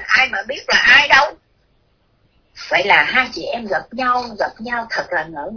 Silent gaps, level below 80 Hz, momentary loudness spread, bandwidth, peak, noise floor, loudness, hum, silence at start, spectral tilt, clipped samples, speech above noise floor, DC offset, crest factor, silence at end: none; -50 dBFS; 15 LU; 5.4 kHz; 0 dBFS; -60 dBFS; -15 LUFS; none; 0 s; -2 dB/octave; under 0.1%; 43 dB; under 0.1%; 18 dB; 0 s